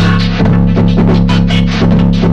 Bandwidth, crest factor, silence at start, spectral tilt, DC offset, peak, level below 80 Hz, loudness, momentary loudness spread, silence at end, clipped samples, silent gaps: 7.4 kHz; 8 dB; 0 s; -7.5 dB/octave; under 0.1%; 0 dBFS; -18 dBFS; -10 LUFS; 1 LU; 0 s; under 0.1%; none